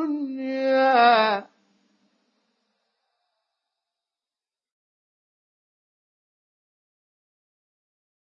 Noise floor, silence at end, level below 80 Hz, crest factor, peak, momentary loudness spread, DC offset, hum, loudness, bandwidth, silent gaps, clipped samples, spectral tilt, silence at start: under -90 dBFS; 6.8 s; under -90 dBFS; 22 dB; -6 dBFS; 13 LU; under 0.1%; none; -20 LUFS; 6.4 kHz; none; under 0.1%; -5.5 dB/octave; 0 s